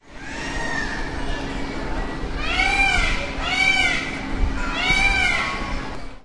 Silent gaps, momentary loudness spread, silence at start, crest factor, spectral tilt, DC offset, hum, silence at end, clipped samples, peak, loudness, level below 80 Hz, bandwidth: none; 12 LU; 0 s; 16 dB; -3 dB/octave; under 0.1%; none; 0.05 s; under 0.1%; -6 dBFS; -21 LUFS; -28 dBFS; 11.5 kHz